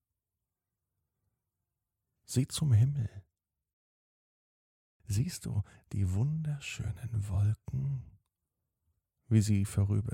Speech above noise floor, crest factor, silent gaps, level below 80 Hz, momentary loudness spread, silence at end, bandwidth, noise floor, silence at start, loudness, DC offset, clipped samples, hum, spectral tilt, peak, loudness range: 59 dB; 20 dB; 3.73-5.00 s; -56 dBFS; 10 LU; 0 s; 15.5 kHz; -89 dBFS; 2.3 s; -33 LUFS; under 0.1%; under 0.1%; none; -6.5 dB/octave; -14 dBFS; 3 LU